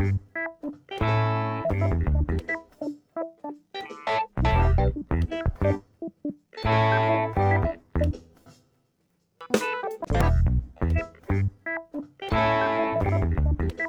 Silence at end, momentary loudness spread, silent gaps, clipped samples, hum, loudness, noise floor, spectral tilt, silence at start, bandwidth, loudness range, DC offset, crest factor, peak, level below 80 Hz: 0 s; 14 LU; none; under 0.1%; none; -26 LUFS; -71 dBFS; -7 dB/octave; 0 s; 12 kHz; 3 LU; under 0.1%; 18 dB; -8 dBFS; -32 dBFS